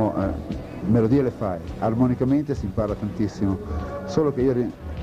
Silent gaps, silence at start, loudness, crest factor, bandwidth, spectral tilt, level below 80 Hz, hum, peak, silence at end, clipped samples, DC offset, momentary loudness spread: none; 0 s; -24 LUFS; 16 dB; 9.8 kHz; -9 dB/octave; -38 dBFS; none; -8 dBFS; 0 s; under 0.1%; under 0.1%; 9 LU